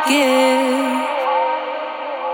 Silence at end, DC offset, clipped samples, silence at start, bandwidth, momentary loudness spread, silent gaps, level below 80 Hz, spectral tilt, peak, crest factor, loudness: 0 s; under 0.1%; under 0.1%; 0 s; 19 kHz; 11 LU; none; -82 dBFS; -1.5 dB/octave; -4 dBFS; 14 dB; -18 LUFS